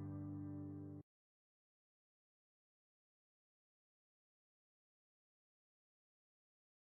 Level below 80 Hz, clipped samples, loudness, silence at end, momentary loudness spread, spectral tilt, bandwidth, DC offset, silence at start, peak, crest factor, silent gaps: -86 dBFS; under 0.1%; -51 LUFS; 5.9 s; 7 LU; -11 dB/octave; 2.1 kHz; under 0.1%; 0 s; -40 dBFS; 18 dB; none